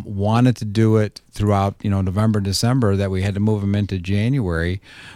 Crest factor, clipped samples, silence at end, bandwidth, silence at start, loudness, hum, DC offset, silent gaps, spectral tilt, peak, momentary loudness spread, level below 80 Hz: 14 dB; under 0.1%; 0 s; 14.5 kHz; 0 s; -19 LUFS; none; under 0.1%; none; -6.5 dB/octave; -4 dBFS; 5 LU; -42 dBFS